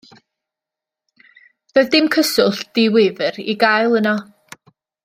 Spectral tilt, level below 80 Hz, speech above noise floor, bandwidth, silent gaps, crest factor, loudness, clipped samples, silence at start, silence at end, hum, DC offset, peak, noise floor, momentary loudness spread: -4 dB/octave; -64 dBFS; 71 dB; 16 kHz; none; 18 dB; -16 LUFS; under 0.1%; 1.75 s; 0.8 s; none; under 0.1%; -2 dBFS; -86 dBFS; 7 LU